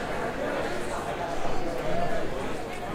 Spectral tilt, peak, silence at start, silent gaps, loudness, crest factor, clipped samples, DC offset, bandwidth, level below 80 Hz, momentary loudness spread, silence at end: -5 dB/octave; -14 dBFS; 0 s; none; -31 LUFS; 14 dB; under 0.1%; under 0.1%; 15 kHz; -40 dBFS; 3 LU; 0 s